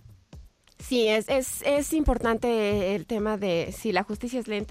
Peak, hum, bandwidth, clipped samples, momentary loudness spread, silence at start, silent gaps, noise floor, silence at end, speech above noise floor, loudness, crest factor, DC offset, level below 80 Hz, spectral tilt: -10 dBFS; none; 16 kHz; under 0.1%; 7 LU; 0.35 s; none; -49 dBFS; 0 s; 24 dB; -26 LUFS; 18 dB; under 0.1%; -40 dBFS; -4.5 dB/octave